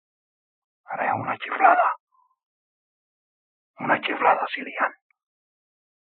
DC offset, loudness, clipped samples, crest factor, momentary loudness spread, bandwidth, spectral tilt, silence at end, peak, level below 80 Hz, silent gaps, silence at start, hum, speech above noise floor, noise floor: under 0.1%; -23 LUFS; under 0.1%; 24 dB; 12 LU; 4.5 kHz; -1.5 dB/octave; 1.2 s; -4 dBFS; -88 dBFS; 2.00-2.07 s, 2.43-3.74 s; 0.9 s; none; over 68 dB; under -90 dBFS